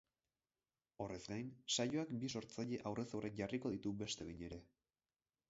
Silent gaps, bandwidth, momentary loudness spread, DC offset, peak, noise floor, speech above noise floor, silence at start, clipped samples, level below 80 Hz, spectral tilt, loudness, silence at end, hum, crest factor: none; 7.6 kHz; 11 LU; under 0.1%; -26 dBFS; under -90 dBFS; over 45 dB; 1 s; under 0.1%; -70 dBFS; -4.5 dB/octave; -45 LUFS; 0.85 s; none; 20 dB